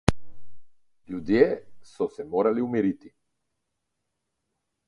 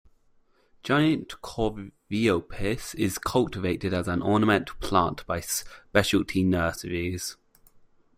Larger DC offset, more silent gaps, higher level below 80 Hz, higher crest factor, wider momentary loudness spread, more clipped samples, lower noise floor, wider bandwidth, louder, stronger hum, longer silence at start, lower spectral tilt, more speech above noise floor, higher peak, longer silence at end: neither; neither; about the same, -46 dBFS vs -48 dBFS; first, 28 dB vs 22 dB; first, 14 LU vs 9 LU; neither; first, -82 dBFS vs -63 dBFS; second, 11.5 kHz vs 16 kHz; about the same, -26 LUFS vs -26 LUFS; neither; second, 0.1 s vs 0.85 s; first, -7 dB/octave vs -5 dB/octave; first, 57 dB vs 37 dB; first, 0 dBFS vs -4 dBFS; first, 1.8 s vs 0.85 s